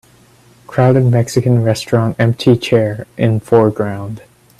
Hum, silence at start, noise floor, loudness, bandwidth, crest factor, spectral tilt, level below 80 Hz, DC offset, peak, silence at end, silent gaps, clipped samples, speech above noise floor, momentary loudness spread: none; 0.7 s; -47 dBFS; -14 LUFS; 13 kHz; 14 dB; -7 dB/octave; -48 dBFS; under 0.1%; 0 dBFS; 0.4 s; none; under 0.1%; 34 dB; 10 LU